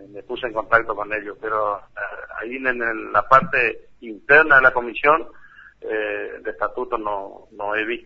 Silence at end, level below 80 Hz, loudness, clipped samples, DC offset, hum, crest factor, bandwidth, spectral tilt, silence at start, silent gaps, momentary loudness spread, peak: 0.05 s; -50 dBFS; -19 LUFS; under 0.1%; under 0.1%; none; 22 dB; 7.4 kHz; -6 dB/octave; 0 s; none; 17 LU; 0 dBFS